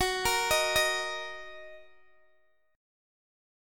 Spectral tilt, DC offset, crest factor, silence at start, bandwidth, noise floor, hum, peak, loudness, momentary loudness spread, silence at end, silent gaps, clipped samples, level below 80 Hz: -1 dB/octave; under 0.1%; 20 dB; 0 s; 17.5 kHz; -70 dBFS; none; -12 dBFS; -27 LUFS; 19 LU; 1 s; none; under 0.1%; -54 dBFS